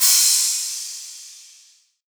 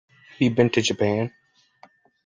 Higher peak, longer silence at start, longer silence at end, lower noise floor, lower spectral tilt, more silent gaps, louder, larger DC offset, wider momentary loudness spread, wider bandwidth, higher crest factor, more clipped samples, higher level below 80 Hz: about the same, -4 dBFS vs -4 dBFS; second, 0 s vs 0.4 s; second, 0.7 s vs 0.95 s; about the same, -54 dBFS vs -55 dBFS; second, 12.5 dB/octave vs -5.5 dB/octave; neither; first, -16 LUFS vs -22 LUFS; neither; first, 24 LU vs 7 LU; first, over 20 kHz vs 9.6 kHz; about the same, 18 dB vs 22 dB; neither; second, under -90 dBFS vs -60 dBFS